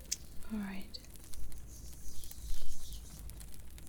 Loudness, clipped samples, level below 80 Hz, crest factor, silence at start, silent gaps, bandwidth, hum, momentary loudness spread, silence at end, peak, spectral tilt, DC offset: -47 LUFS; under 0.1%; -46 dBFS; 20 dB; 0 s; none; 19.5 kHz; none; 10 LU; 0 s; -14 dBFS; -3.5 dB/octave; 0.2%